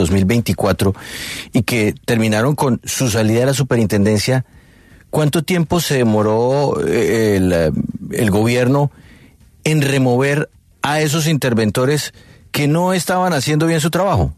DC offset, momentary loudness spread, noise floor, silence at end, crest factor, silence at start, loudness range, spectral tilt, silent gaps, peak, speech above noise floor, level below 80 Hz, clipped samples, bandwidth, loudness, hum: under 0.1%; 6 LU; -46 dBFS; 0.05 s; 14 dB; 0 s; 1 LU; -5.5 dB/octave; none; -2 dBFS; 31 dB; -40 dBFS; under 0.1%; 13.5 kHz; -16 LUFS; none